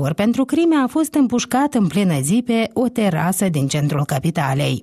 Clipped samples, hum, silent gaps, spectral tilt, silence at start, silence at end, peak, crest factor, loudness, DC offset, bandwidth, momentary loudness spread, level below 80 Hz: under 0.1%; none; none; -5.5 dB/octave; 0 s; 0 s; -6 dBFS; 10 dB; -18 LUFS; under 0.1%; 14 kHz; 3 LU; -52 dBFS